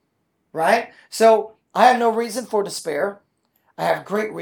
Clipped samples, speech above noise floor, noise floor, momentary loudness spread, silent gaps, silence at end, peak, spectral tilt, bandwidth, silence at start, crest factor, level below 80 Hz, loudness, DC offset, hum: under 0.1%; 51 dB; -70 dBFS; 11 LU; none; 0 s; -2 dBFS; -3.5 dB/octave; 19.5 kHz; 0.55 s; 20 dB; -76 dBFS; -20 LUFS; under 0.1%; none